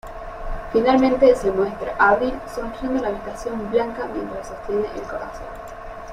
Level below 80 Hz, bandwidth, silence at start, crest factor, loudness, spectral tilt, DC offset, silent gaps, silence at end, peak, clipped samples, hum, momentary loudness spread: -38 dBFS; 14 kHz; 0.05 s; 18 dB; -21 LUFS; -6 dB/octave; under 0.1%; none; 0 s; -4 dBFS; under 0.1%; none; 18 LU